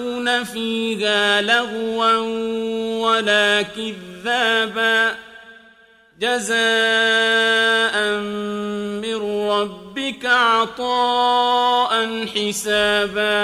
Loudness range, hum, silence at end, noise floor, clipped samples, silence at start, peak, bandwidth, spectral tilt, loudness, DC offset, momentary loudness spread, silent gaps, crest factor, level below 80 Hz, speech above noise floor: 2 LU; none; 0 s; -51 dBFS; under 0.1%; 0 s; -2 dBFS; 14.5 kHz; -2.5 dB/octave; -18 LUFS; under 0.1%; 10 LU; none; 18 dB; -58 dBFS; 32 dB